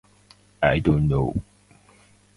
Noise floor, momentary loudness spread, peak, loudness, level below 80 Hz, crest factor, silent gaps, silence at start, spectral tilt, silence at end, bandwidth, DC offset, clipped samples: -56 dBFS; 8 LU; -2 dBFS; -22 LUFS; -38 dBFS; 22 dB; none; 0.6 s; -8.5 dB/octave; 0.95 s; 11 kHz; under 0.1%; under 0.1%